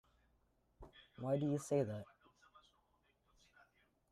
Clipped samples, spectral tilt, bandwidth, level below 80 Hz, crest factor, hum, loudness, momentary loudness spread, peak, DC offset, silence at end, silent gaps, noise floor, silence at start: under 0.1%; -7 dB/octave; 13.5 kHz; -72 dBFS; 20 dB; none; -40 LUFS; 23 LU; -26 dBFS; under 0.1%; 2.05 s; none; -78 dBFS; 0.8 s